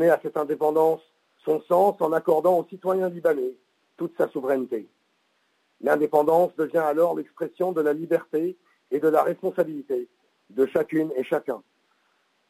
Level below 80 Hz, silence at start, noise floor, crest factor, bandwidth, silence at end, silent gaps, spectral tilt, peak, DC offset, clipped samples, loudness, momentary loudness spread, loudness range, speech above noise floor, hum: -78 dBFS; 0 s; -69 dBFS; 18 dB; 16 kHz; 0.9 s; none; -7 dB/octave; -8 dBFS; under 0.1%; under 0.1%; -24 LUFS; 11 LU; 4 LU; 46 dB; none